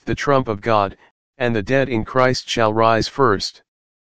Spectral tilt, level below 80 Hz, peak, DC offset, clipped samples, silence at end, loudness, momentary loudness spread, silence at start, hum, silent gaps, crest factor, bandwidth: -5.5 dB/octave; -44 dBFS; 0 dBFS; 2%; under 0.1%; 0.35 s; -18 LUFS; 6 LU; 0 s; none; 1.11-1.33 s; 18 dB; 9.6 kHz